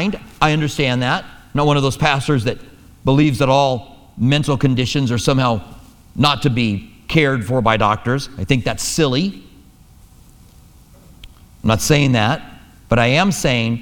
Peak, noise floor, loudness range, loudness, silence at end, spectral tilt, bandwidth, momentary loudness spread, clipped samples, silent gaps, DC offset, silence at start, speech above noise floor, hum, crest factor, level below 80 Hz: 0 dBFS; -45 dBFS; 4 LU; -17 LUFS; 0 s; -5 dB/octave; 18 kHz; 9 LU; under 0.1%; none; under 0.1%; 0 s; 29 dB; none; 18 dB; -38 dBFS